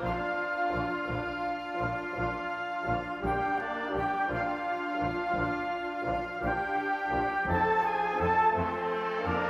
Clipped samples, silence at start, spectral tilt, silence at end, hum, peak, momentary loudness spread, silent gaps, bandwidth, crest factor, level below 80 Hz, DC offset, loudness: under 0.1%; 0 s; -7 dB/octave; 0 s; none; -14 dBFS; 6 LU; none; 13.5 kHz; 16 dB; -48 dBFS; under 0.1%; -30 LUFS